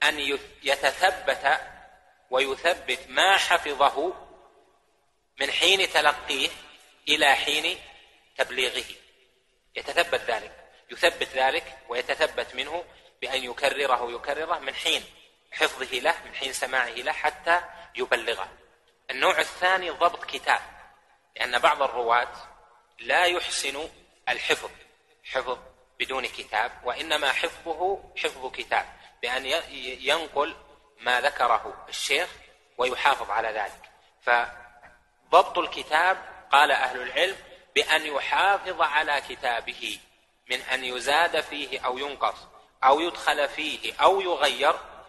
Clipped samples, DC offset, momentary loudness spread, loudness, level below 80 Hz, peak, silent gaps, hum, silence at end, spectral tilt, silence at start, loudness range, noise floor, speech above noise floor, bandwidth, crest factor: under 0.1%; under 0.1%; 12 LU; -25 LUFS; -60 dBFS; -4 dBFS; none; none; 0.05 s; -1 dB/octave; 0 s; 5 LU; -69 dBFS; 44 dB; 12 kHz; 24 dB